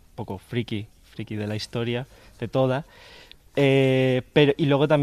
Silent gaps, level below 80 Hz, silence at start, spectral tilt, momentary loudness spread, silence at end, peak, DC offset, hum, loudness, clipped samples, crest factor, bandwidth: none; -54 dBFS; 0.2 s; -7 dB/octave; 17 LU; 0 s; -4 dBFS; under 0.1%; none; -23 LUFS; under 0.1%; 20 dB; 13.5 kHz